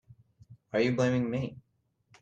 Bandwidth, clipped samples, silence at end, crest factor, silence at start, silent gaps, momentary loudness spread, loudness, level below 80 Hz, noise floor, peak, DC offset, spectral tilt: 8.2 kHz; under 0.1%; 0.6 s; 18 dB; 0.5 s; none; 9 LU; -30 LUFS; -66 dBFS; -70 dBFS; -16 dBFS; under 0.1%; -7 dB/octave